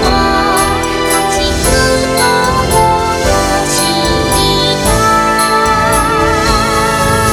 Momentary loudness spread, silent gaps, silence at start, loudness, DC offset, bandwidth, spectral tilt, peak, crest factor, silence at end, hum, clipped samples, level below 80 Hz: 2 LU; none; 0 s; -10 LUFS; under 0.1%; 18.5 kHz; -3.5 dB/octave; 0 dBFS; 10 dB; 0 s; none; under 0.1%; -22 dBFS